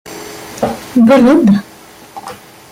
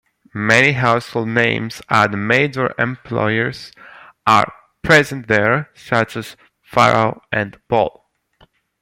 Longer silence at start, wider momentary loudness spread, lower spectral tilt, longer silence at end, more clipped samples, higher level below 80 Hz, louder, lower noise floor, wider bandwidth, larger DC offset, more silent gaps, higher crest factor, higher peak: second, 0.05 s vs 0.35 s; first, 23 LU vs 10 LU; about the same, -6.5 dB/octave vs -5.5 dB/octave; second, 0.35 s vs 0.9 s; neither; about the same, -48 dBFS vs -52 dBFS; first, -10 LUFS vs -16 LUFS; second, -33 dBFS vs -55 dBFS; about the same, 16 kHz vs 16.5 kHz; neither; neither; second, 12 dB vs 18 dB; about the same, -2 dBFS vs 0 dBFS